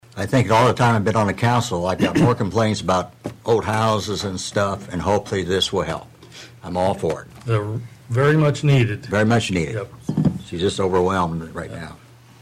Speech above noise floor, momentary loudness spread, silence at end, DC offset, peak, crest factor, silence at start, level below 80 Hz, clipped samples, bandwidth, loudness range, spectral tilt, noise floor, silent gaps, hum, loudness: 23 dB; 13 LU; 0.45 s; under 0.1%; -8 dBFS; 12 dB; 0.15 s; -46 dBFS; under 0.1%; 14.5 kHz; 4 LU; -6 dB/octave; -42 dBFS; none; none; -20 LUFS